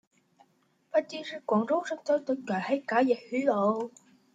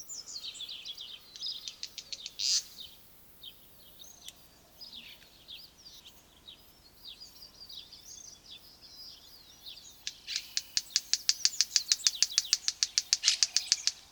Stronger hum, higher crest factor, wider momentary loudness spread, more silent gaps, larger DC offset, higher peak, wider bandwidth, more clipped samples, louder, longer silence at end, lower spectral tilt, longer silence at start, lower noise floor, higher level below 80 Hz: neither; second, 18 dB vs 34 dB; second, 8 LU vs 24 LU; neither; neither; second, -12 dBFS vs -2 dBFS; second, 9.2 kHz vs over 20 kHz; neither; about the same, -29 LUFS vs -30 LUFS; first, 0.45 s vs 0.1 s; first, -6 dB/octave vs 3.5 dB/octave; first, 0.95 s vs 0 s; first, -69 dBFS vs -58 dBFS; second, -80 dBFS vs -70 dBFS